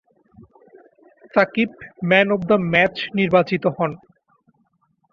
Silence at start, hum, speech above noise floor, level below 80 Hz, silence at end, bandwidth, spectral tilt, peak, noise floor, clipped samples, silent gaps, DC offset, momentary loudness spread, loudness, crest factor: 1.35 s; none; 47 dB; -58 dBFS; 1.15 s; 6.6 kHz; -7.5 dB/octave; -2 dBFS; -66 dBFS; under 0.1%; none; under 0.1%; 9 LU; -19 LUFS; 20 dB